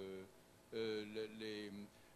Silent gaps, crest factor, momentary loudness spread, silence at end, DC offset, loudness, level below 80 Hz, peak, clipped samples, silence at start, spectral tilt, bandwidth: none; 16 dB; 13 LU; 0 s; under 0.1%; -48 LUFS; -80 dBFS; -32 dBFS; under 0.1%; 0 s; -5 dB/octave; 13 kHz